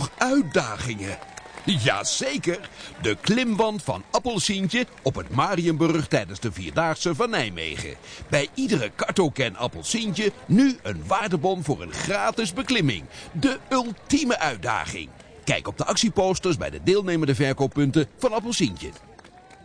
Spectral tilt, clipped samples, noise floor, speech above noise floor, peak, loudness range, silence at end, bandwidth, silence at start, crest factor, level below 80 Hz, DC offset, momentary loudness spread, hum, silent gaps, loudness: -4.5 dB/octave; under 0.1%; -48 dBFS; 24 dB; -6 dBFS; 2 LU; 0.1 s; 10.5 kHz; 0 s; 18 dB; -50 dBFS; under 0.1%; 10 LU; none; none; -24 LUFS